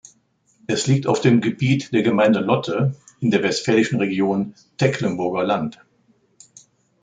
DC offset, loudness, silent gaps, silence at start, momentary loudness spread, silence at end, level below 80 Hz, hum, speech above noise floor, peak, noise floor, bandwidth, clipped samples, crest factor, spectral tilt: under 0.1%; -20 LUFS; none; 0.7 s; 8 LU; 1.3 s; -60 dBFS; none; 43 dB; -2 dBFS; -62 dBFS; 9.4 kHz; under 0.1%; 18 dB; -6 dB/octave